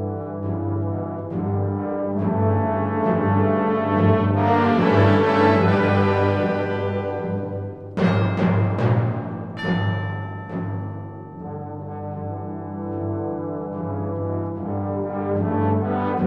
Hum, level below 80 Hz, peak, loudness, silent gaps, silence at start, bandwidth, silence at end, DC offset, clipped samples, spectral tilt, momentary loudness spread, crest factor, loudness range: 50 Hz at -35 dBFS; -54 dBFS; -4 dBFS; -22 LUFS; none; 0 s; 6 kHz; 0 s; 0.1%; under 0.1%; -9 dB/octave; 13 LU; 16 dB; 11 LU